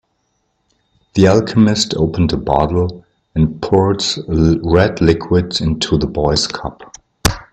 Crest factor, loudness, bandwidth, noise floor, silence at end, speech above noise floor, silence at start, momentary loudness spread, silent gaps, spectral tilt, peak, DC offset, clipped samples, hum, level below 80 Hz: 16 dB; -15 LUFS; 15 kHz; -66 dBFS; 0.1 s; 52 dB; 1.15 s; 7 LU; none; -5.5 dB/octave; 0 dBFS; under 0.1%; under 0.1%; none; -32 dBFS